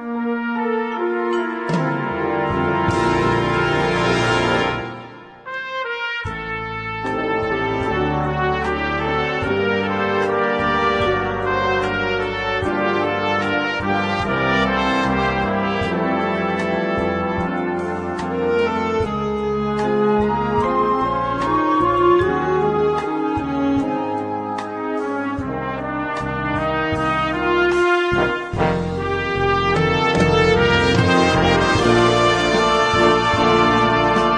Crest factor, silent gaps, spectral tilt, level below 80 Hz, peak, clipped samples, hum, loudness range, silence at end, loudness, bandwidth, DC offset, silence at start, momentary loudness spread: 18 dB; none; -6 dB/octave; -38 dBFS; -2 dBFS; under 0.1%; none; 7 LU; 0 s; -19 LUFS; 10.5 kHz; under 0.1%; 0 s; 9 LU